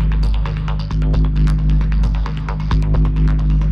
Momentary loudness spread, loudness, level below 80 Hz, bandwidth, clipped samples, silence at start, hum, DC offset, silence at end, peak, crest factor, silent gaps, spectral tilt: 5 LU; -18 LUFS; -16 dBFS; 5.6 kHz; under 0.1%; 0 s; none; under 0.1%; 0 s; -6 dBFS; 8 dB; none; -8.5 dB/octave